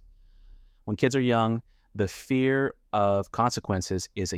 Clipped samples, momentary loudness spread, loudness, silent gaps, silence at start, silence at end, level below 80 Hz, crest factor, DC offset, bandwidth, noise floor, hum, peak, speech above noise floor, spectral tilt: under 0.1%; 9 LU; -27 LUFS; none; 0.85 s; 0 s; -54 dBFS; 20 dB; under 0.1%; 15.5 kHz; -53 dBFS; none; -8 dBFS; 27 dB; -5.5 dB/octave